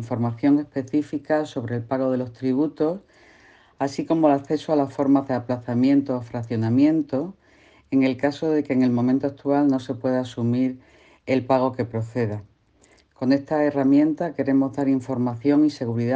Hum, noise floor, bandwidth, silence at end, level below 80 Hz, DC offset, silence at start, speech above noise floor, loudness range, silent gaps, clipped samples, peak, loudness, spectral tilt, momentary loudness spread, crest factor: none; -58 dBFS; 7.8 kHz; 0 s; -64 dBFS; under 0.1%; 0 s; 36 dB; 4 LU; none; under 0.1%; -4 dBFS; -23 LUFS; -8 dB/octave; 9 LU; 18 dB